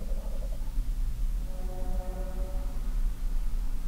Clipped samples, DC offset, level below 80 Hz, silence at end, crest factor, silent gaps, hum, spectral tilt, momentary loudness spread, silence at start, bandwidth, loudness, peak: under 0.1%; under 0.1%; -30 dBFS; 0 s; 10 dB; none; none; -6.5 dB/octave; 2 LU; 0 s; 15.5 kHz; -37 LUFS; -18 dBFS